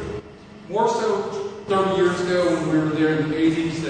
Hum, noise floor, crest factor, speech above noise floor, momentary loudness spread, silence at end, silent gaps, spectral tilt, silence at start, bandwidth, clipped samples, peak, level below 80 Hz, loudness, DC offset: none; -41 dBFS; 14 dB; 21 dB; 9 LU; 0 s; none; -6 dB/octave; 0 s; 9.6 kHz; under 0.1%; -8 dBFS; -50 dBFS; -21 LUFS; under 0.1%